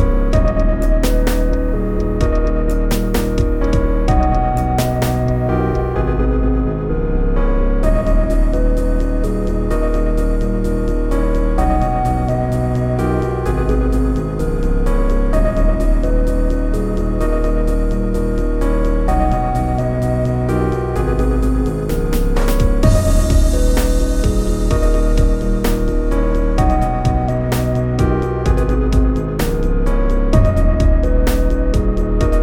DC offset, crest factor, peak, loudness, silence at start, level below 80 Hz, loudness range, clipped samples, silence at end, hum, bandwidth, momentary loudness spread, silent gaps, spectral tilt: under 0.1%; 12 dB; -2 dBFS; -17 LUFS; 0 s; -16 dBFS; 2 LU; under 0.1%; 0 s; none; 17 kHz; 4 LU; none; -7 dB/octave